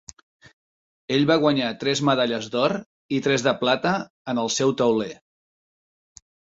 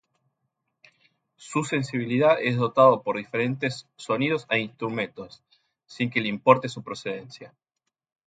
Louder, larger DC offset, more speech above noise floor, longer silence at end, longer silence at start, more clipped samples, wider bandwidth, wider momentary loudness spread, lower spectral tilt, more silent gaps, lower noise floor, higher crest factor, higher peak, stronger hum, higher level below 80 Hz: about the same, -22 LUFS vs -24 LUFS; neither; first, over 68 dB vs 58 dB; first, 1.35 s vs 0.8 s; second, 1.1 s vs 1.4 s; neither; second, 8 kHz vs 9.4 kHz; second, 8 LU vs 16 LU; second, -4.5 dB/octave vs -6 dB/octave; first, 2.86-3.09 s, 4.10-4.25 s vs none; first, under -90 dBFS vs -83 dBFS; about the same, 20 dB vs 24 dB; about the same, -4 dBFS vs -2 dBFS; neither; first, -64 dBFS vs -70 dBFS